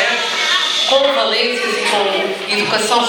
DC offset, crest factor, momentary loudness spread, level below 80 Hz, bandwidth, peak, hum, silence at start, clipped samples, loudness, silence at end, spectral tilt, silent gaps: under 0.1%; 16 dB; 4 LU; -64 dBFS; over 20 kHz; 0 dBFS; none; 0 s; under 0.1%; -14 LUFS; 0 s; -1 dB/octave; none